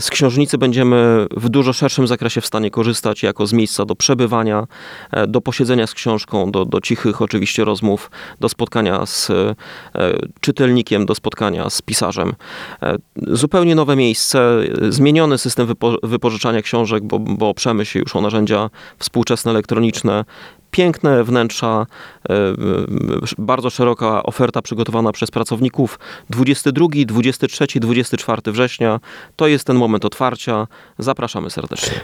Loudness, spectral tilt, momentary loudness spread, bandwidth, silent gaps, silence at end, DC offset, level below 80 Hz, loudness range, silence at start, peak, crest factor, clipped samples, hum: -16 LUFS; -5 dB/octave; 8 LU; 16.5 kHz; none; 0 s; under 0.1%; -50 dBFS; 3 LU; 0 s; 0 dBFS; 16 dB; under 0.1%; none